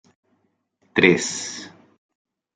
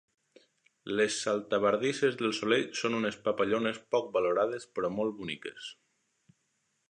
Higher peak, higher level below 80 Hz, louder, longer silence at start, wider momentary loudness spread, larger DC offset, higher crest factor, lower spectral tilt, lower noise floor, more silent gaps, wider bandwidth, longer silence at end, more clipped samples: first, -2 dBFS vs -12 dBFS; first, -64 dBFS vs -72 dBFS; first, -20 LUFS vs -30 LUFS; about the same, 0.95 s vs 0.85 s; first, 20 LU vs 10 LU; neither; about the same, 24 dB vs 20 dB; about the same, -3.5 dB/octave vs -4 dB/octave; second, -69 dBFS vs -77 dBFS; neither; about the same, 9.6 kHz vs 10.5 kHz; second, 0.85 s vs 1.15 s; neither